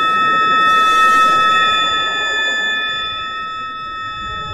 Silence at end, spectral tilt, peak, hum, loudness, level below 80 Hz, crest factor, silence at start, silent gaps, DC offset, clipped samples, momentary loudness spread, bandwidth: 0 s; -1.5 dB/octave; -2 dBFS; none; -13 LUFS; -46 dBFS; 14 dB; 0 s; none; under 0.1%; under 0.1%; 14 LU; 15.5 kHz